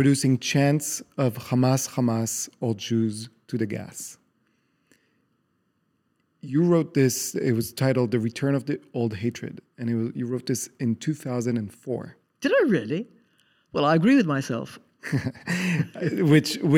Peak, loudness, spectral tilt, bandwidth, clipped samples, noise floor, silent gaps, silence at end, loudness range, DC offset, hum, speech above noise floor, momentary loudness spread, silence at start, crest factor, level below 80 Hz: -6 dBFS; -25 LUFS; -5.5 dB/octave; 17 kHz; under 0.1%; -71 dBFS; none; 0 s; 7 LU; under 0.1%; none; 47 dB; 13 LU; 0 s; 20 dB; -68 dBFS